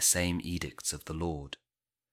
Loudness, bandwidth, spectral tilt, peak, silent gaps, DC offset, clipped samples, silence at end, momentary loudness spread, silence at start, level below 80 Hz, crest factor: -33 LUFS; 16.5 kHz; -3 dB/octave; -12 dBFS; none; under 0.1%; under 0.1%; 0.55 s; 16 LU; 0 s; -50 dBFS; 22 dB